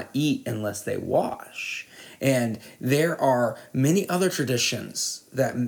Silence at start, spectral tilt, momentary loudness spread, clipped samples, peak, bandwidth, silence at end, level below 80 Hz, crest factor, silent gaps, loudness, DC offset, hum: 0 s; -4.5 dB/octave; 9 LU; under 0.1%; -8 dBFS; 19.5 kHz; 0 s; -68 dBFS; 16 dB; none; -25 LUFS; under 0.1%; none